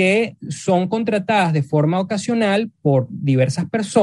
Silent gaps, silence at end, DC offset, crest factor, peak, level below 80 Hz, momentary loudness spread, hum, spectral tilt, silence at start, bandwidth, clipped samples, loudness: none; 0 s; under 0.1%; 16 dB; -2 dBFS; -62 dBFS; 4 LU; none; -6.5 dB/octave; 0 s; 11.5 kHz; under 0.1%; -19 LUFS